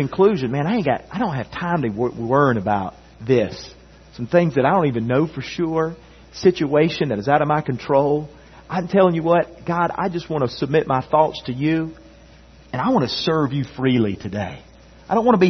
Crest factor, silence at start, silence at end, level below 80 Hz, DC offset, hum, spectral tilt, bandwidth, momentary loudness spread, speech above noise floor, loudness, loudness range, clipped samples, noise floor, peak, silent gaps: 18 dB; 0 s; 0 s; -50 dBFS; under 0.1%; none; -7.5 dB/octave; 6.4 kHz; 10 LU; 27 dB; -20 LUFS; 3 LU; under 0.1%; -46 dBFS; -2 dBFS; none